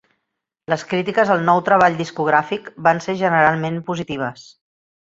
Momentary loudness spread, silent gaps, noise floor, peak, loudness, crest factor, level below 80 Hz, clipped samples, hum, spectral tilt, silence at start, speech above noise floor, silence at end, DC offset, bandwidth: 10 LU; none; -78 dBFS; 0 dBFS; -18 LUFS; 18 dB; -60 dBFS; under 0.1%; none; -6 dB/octave; 0.7 s; 60 dB; 0.65 s; under 0.1%; 8 kHz